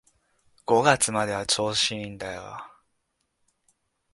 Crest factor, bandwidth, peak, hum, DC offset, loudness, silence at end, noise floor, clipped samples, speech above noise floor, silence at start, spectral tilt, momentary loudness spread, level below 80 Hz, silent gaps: 24 dB; 12 kHz; -4 dBFS; none; under 0.1%; -24 LUFS; 1.45 s; -76 dBFS; under 0.1%; 51 dB; 0.7 s; -2.5 dB/octave; 19 LU; -60 dBFS; none